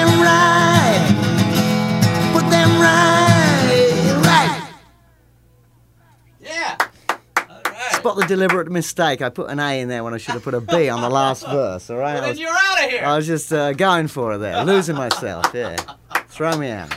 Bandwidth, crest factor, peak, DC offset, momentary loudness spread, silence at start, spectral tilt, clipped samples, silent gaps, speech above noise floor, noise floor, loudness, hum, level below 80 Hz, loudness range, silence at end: 16 kHz; 18 dB; 0 dBFS; under 0.1%; 13 LU; 0 s; -5 dB/octave; under 0.1%; none; 33 dB; -53 dBFS; -17 LUFS; none; -52 dBFS; 8 LU; 0 s